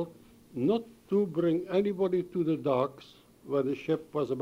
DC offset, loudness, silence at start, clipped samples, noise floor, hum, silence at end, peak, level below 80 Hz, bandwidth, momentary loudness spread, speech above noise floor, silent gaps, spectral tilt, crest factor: under 0.1%; -30 LUFS; 0 s; under 0.1%; -52 dBFS; none; 0 s; -14 dBFS; -68 dBFS; 15.5 kHz; 5 LU; 23 dB; none; -8.5 dB/octave; 16 dB